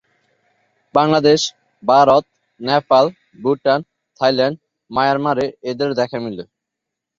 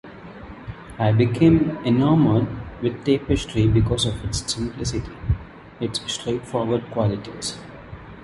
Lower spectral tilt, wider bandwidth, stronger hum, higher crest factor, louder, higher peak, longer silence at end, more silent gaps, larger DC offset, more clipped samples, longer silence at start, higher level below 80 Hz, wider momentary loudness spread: about the same, -5 dB/octave vs -6 dB/octave; second, 7.6 kHz vs 11.5 kHz; neither; about the same, 16 dB vs 18 dB; first, -17 LUFS vs -22 LUFS; about the same, -2 dBFS vs -4 dBFS; first, 0.75 s vs 0 s; neither; neither; neither; first, 0.95 s vs 0.05 s; second, -58 dBFS vs -36 dBFS; second, 12 LU vs 21 LU